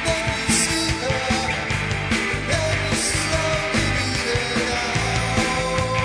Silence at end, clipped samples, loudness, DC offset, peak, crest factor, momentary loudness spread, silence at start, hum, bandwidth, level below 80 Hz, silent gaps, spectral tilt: 0 s; under 0.1%; -21 LUFS; under 0.1%; -8 dBFS; 14 dB; 3 LU; 0 s; none; 11 kHz; -34 dBFS; none; -3.5 dB/octave